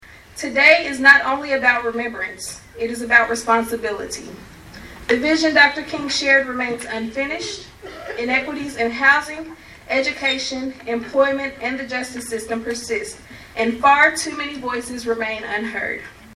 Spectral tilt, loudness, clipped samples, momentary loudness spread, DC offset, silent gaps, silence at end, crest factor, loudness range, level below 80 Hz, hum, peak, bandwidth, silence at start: -2.5 dB/octave; -18 LUFS; under 0.1%; 18 LU; under 0.1%; none; 0 s; 20 dB; 6 LU; -50 dBFS; none; 0 dBFS; 15 kHz; 0.1 s